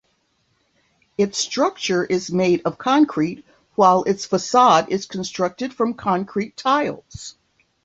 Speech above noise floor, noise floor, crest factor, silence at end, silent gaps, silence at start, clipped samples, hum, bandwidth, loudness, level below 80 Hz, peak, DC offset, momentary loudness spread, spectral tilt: 47 dB; -66 dBFS; 20 dB; 0.55 s; none; 1.2 s; under 0.1%; none; 8.2 kHz; -20 LUFS; -58 dBFS; -2 dBFS; under 0.1%; 14 LU; -4.5 dB/octave